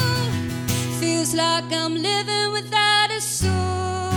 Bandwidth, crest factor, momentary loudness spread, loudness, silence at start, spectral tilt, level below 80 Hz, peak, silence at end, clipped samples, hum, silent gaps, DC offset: over 20 kHz; 16 dB; 7 LU; -21 LUFS; 0 s; -3.5 dB/octave; -46 dBFS; -6 dBFS; 0 s; under 0.1%; none; none; under 0.1%